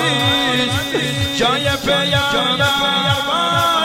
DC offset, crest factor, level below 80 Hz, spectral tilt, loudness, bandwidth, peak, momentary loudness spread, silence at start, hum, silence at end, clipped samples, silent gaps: under 0.1%; 14 dB; -44 dBFS; -3.5 dB/octave; -15 LUFS; 16.5 kHz; -4 dBFS; 4 LU; 0 s; none; 0 s; under 0.1%; none